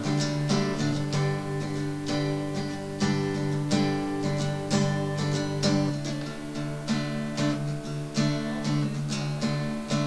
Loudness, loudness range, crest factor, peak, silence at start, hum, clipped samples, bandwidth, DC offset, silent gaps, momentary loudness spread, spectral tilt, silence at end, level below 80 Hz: -28 LUFS; 2 LU; 16 dB; -12 dBFS; 0 s; none; under 0.1%; 11 kHz; 0.4%; none; 6 LU; -5.5 dB/octave; 0 s; -52 dBFS